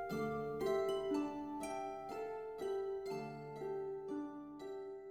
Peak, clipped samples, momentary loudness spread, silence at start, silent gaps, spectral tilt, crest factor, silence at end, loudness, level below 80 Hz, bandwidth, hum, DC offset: -26 dBFS; under 0.1%; 10 LU; 0 s; none; -6 dB/octave; 14 dB; 0 s; -43 LUFS; -72 dBFS; 16 kHz; none; under 0.1%